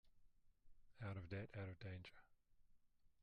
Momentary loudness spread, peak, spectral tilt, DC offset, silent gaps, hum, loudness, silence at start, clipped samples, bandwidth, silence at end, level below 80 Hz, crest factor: 6 LU; -38 dBFS; -8 dB/octave; under 0.1%; none; none; -54 LUFS; 0.05 s; under 0.1%; 6.4 kHz; 0 s; -74 dBFS; 18 dB